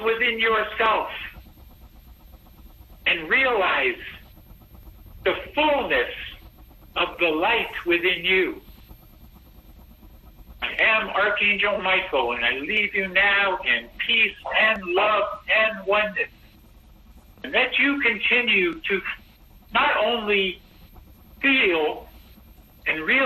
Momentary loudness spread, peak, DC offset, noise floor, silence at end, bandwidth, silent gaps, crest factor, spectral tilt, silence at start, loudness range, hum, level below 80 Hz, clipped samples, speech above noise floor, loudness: 11 LU; -8 dBFS; under 0.1%; -50 dBFS; 0 s; 13 kHz; none; 16 dB; -5 dB/octave; 0 s; 5 LU; none; -50 dBFS; under 0.1%; 28 dB; -21 LUFS